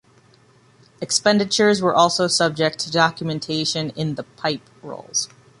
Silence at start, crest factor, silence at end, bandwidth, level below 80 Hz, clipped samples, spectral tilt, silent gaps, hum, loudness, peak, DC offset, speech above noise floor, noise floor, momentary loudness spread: 1 s; 18 dB; 0.35 s; 11.5 kHz; -62 dBFS; under 0.1%; -3.5 dB/octave; none; none; -20 LUFS; -2 dBFS; under 0.1%; 34 dB; -54 dBFS; 12 LU